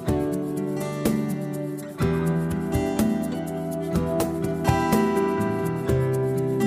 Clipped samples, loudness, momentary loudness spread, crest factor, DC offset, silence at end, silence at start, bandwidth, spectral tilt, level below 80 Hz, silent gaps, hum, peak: under 0.1%; -25 LUFS; 7 LU; 16 dB; under 0.1%; 0 s; 0 s; 16 kHz; -7 dB/octave; -44 dBFS; none; none; -8 dBFS